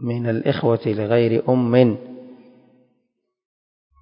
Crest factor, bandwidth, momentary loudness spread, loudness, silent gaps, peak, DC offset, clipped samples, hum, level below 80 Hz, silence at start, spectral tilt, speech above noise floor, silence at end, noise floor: 20 dB; 5.4 kHz; 14 LU; -19 LUFS; none; 0 dBFS; under 0.1%; under 0.1%; none; -60 dBFS; 0 s; -12.5 dB/octave; 55 dB; 1.7 s; -73 dBFS